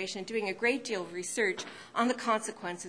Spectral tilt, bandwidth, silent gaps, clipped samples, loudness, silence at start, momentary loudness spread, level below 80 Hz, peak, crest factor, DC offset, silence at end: -3 dB/octave; 10.5 kHz; none; under 0.1%; -32 LUFS; 0 s; 7 LU; -78 dBFS; -12 dBFS; 20 dB; under 0.1%; 0 s